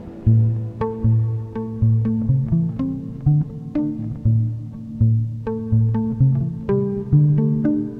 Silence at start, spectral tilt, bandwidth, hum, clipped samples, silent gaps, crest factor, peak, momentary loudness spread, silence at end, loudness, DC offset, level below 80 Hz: 0 s; -12.5 dB/octave; 2.7 kHz; none; under 0.1%; none; 14 dB; -6 dBFS; 8 LU; 0 s; -20 LUFS; under 0.1%; -38 dBFS